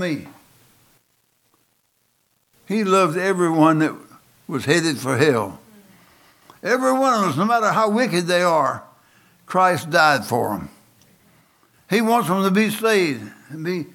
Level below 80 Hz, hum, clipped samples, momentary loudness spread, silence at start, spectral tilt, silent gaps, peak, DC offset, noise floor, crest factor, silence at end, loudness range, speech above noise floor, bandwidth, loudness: -66 dBFS; none; under 0.1%; 14 LU; 0 s; -5 dB/octave; none; -2 dBFS; under 0.1%; -66 dBFS; 20 dB; 0.1 s; 3 LU; 48 dB; 18.5 kHz; -19 LUFS